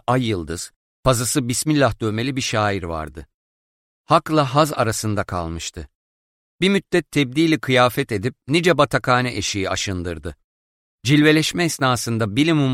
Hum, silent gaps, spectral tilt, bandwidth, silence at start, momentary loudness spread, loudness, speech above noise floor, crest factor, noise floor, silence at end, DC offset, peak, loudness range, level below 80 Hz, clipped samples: none; 0.76-1.03 s, 3.34-4.04 s, 5.95-6.58 s, 10.44-10.98 s; -4.5 dB/octave; 16 kHz; 0.1 s; 13 LU; -19 LUFS; over 71 dB; 18 dB; under -90 dBFS; 0 s; under 0.1%; -2 dBFS; 3 LU; -44 dBFS; under 0.1%